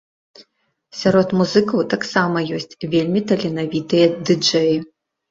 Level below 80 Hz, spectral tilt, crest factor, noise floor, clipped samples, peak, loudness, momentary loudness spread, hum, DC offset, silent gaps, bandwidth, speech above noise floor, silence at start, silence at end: -58 dBFS; -5.5 dB/octave; 16 dB; -64 dBFS; under 0.1%; -2 dBFS; -18 LUFS; 7 LU; none; under 0.1%; none; 7.8 kHz; 47 dB; 0.4 s; 0.45 s